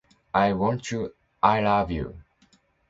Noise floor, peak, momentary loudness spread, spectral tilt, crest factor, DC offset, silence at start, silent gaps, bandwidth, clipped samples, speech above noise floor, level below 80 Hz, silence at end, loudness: -63 dBFS; -2 dBFS; 11 LU; -6 dB/octave; 24 dB; under 0.1%; 0.35 s; none; 8 kHz; under 0.1%; 39 dB; -46 dBFS; 0.7 s; -25 LUFS